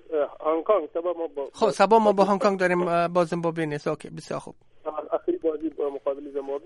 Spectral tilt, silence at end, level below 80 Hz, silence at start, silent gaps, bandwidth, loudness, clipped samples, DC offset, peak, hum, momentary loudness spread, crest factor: -6 dB/octave; 0.05 s; -64 dBFS; 0.1 s; none; 11.5 kHz; -25 LUFS; under 0.1%; under 0.1%; -6 dBFS; none; 15 LU; 20 dB